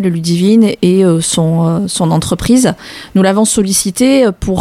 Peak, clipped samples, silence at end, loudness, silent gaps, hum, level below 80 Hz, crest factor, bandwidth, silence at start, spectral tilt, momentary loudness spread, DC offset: 0 dBFS; under 0.1%; 0 s; -11 LUFS; none; none; -36 dBFS; 10 dB; 15.5 kHz; 0 s; -5 dB/octave; 4 LU; under 0.1%